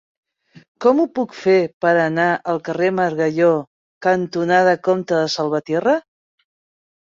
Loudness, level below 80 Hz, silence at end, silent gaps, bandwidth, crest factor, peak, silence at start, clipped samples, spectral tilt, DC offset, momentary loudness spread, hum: -18 LUFS; -64 dBFS; 1.1 s; 1.73-1.80 s, 3.67-4.01 s; 7.6 kHz; 16 dB; -2 dBFS; 0.8 s; under 0.1%; -6 dB/octave; under 0.1%; 6 LU; none